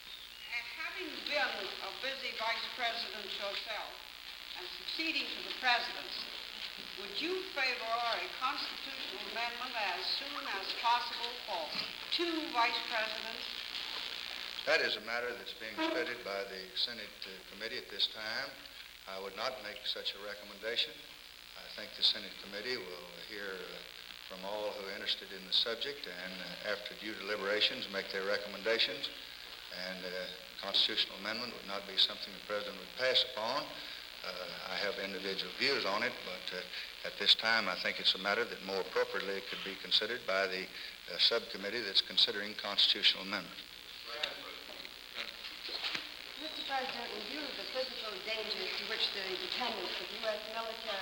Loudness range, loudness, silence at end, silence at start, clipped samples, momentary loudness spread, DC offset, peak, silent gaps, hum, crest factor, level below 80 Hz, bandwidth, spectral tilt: 7 LU; -35 LUFS; 0 s; 0 s; under 0.1%; 14 LU; under 0.1%; -14 dBFS; none; none; 22 dB; -70 dBFS; over 20 kHz; -2 dB/octave